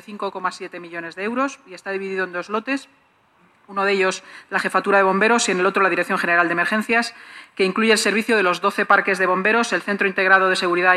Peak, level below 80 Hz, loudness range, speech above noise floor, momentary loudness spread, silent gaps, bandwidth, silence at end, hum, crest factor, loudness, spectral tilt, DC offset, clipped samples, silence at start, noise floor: -2 dBFS; -72 dBFS; 9 LU; 38 dB; 13 LU; none; 13.5 kHz; 0 s; none; 18 dB; -19 LUFS; -3.5 dB/octave; under 0.1%; under 0.1%; 0.1 s; -57 dBFS